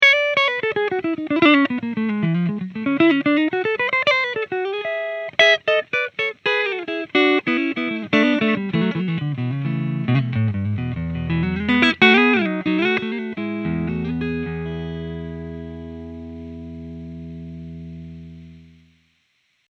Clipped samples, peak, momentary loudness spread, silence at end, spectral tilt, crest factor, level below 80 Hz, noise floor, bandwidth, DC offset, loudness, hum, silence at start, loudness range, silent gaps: under 0.1%; 0 dBFS; 20 LU; 1.05 s; -6.5 dB/octave; 20 dB; -46 dBFS; -66 dBFS; 8.2 kHz; under 0.1%; -19 LUFS; none; 0 s; 15 LU; none